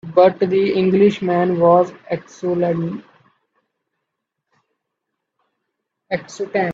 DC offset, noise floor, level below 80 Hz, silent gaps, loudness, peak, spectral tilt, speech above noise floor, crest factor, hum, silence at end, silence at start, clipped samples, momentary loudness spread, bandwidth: under 0.1%; -78 dBFS; -60 dBFS; none; -17 LUFS; 0 dBFS; -7.5 dB/octave; 62 dB; 18 dB; none; 0 s; 0.05 s; under 0.1%; 13 LU; 7.6 kHz